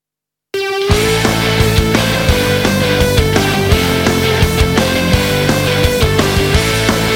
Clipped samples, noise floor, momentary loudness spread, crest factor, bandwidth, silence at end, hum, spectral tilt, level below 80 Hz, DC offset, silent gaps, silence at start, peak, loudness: under 0.1%; -83 dBFS; 1 LU; 12 dB; 17 kHz; 0 s; none; -4.5 dB/octave; -22 dBFS; under 0.1%; none; 0.55 s; 0 dBFS; -12 LUFS